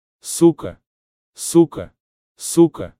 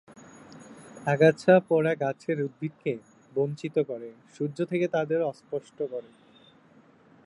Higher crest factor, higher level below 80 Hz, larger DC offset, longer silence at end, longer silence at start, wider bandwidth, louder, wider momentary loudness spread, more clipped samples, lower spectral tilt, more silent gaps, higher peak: about the same, 18 dB vs 20 dB; first, -54 dBFS vs -76 dBFS; neither; second, 0.1 s vs 1.25 s; about the same, 0.25 s vs 0.15 s; first, 15.5 kHz vs 10.5 kHz; first, -17 LUFS vs -27 LUFS; about the same, 18 LU vs 18 LU; neither; second, -6 dB/octave vs -7.5 dB/octave; first, 0.86-1.33 s, 2.00-2.35 s vs none; first, -2 dBFS vs -8 dBFS